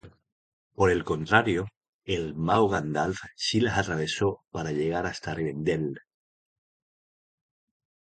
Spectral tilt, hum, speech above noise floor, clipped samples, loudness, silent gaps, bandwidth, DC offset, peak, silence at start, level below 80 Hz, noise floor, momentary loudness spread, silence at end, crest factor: -5.5 dB/octave; none; over 63 dB; under 0.1%; -27 LUFS; 0.32-0.70 s, 1.77-1.81 s, 1.89-1.99 s; 9.4 kHz; under 0.1%; -4 dBFS; 0.05 s; -50 dBFS; under -90 dBFS; 9 LU; 2.1 s; 26 dB